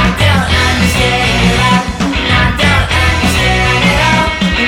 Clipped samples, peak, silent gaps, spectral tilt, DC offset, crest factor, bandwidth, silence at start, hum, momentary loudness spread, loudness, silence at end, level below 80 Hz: under 0.1%; 0 dBFS; none; -4.5 dB/octave; under 0.1%; 10 dB; 18.5 kHz; 0 s; none; 2 LU; -10 LUFS; 0 s; -20 dBFS